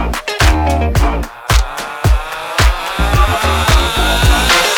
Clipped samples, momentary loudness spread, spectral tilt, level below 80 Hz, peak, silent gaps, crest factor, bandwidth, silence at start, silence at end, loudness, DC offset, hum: under 0.1%; 6 LU; -4 dB/octave; -16 dBFS; 0 dBFS; none; 12 dB; 18.5 kHz; 0 s; 0 s; -13 LUFS; under 0.1%; none